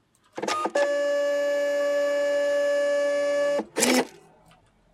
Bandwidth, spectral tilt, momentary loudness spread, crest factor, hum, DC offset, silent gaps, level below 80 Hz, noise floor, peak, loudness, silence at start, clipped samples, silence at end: 15.5 kHz; -2 dB/octave; 6 LU; 22 dB; none; under 0.1%; none; -72 dBFS; -58 dBFS; -4 dBFS; -24 LUFS; 0.35 s; under 0.1%; 0.85 s